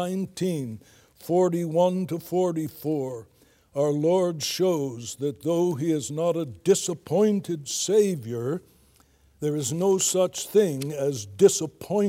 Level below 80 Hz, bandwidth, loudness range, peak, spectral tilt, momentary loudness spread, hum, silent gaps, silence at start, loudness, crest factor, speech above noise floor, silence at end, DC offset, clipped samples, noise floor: -68 dBFS; 16.5 kHz; 2 LU; -6 dBFS; -5 dB/octave; 9 LU; none; none; 0 s; -25 LUFS; 20 dB; 35 dB; 0 s; under 0.1%; under 0.1%; -59 dBFS